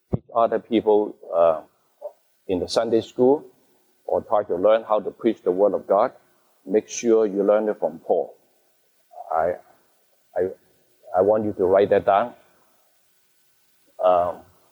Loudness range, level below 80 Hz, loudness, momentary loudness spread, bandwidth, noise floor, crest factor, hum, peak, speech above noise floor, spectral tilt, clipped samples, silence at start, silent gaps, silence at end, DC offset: 4 LU; -56 dBFS; -22 LUFS; 12 LU; over 20 kHz; -63 dBFS; 16 dB; none; -6 dBFS; 43 dB; -5.5 dB/octave; under 0.1%; 0.1 s; none; 0.3 s; under 0.1%